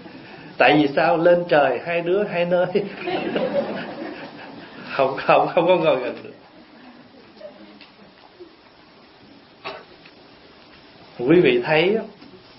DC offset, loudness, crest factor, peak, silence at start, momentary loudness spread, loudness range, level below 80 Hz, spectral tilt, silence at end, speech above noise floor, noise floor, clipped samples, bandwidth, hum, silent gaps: under 0.1%; -19 LUFS; 20 dB; -2 dBFS; 0 s; 22 LU; 23 LU; -62 dBFS; -10.5 dB/octave; 0.2 s; 31 dB; -49 dBFS; under 0.1%; 5.8 kHz; none; none